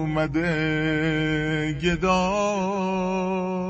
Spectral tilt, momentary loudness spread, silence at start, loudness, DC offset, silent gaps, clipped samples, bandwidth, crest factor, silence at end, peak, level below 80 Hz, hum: -6 dB/octave; 4 LU; 0 s; -24 LUFS; under 0.1%; none; under 0.1%; 8.2 kHz; 14 dB; 0 s; -8 dBFS; -42 dBFS; none